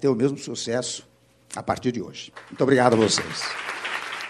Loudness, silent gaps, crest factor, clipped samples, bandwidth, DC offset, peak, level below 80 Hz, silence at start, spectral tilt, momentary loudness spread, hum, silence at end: -24 LUFS; none; 22 dB; under 0.1%; 12.5 kHz; under 0.1%; -2 dBFS; -62 dBFS; 0 s; -4 dB/octave; 17 LU; none; 0 s